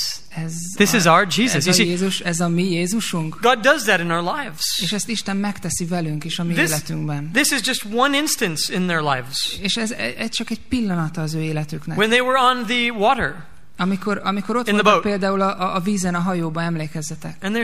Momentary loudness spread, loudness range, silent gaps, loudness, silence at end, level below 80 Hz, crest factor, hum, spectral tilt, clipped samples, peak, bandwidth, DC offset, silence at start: 10 LU; 4 LU; none; -19 LUFS; 0 s; -50 dBFS; 20 dB; none; -4 dB/octave; under 0.1%; 0 dBFS; 15.5 kHz; 2%; 0 s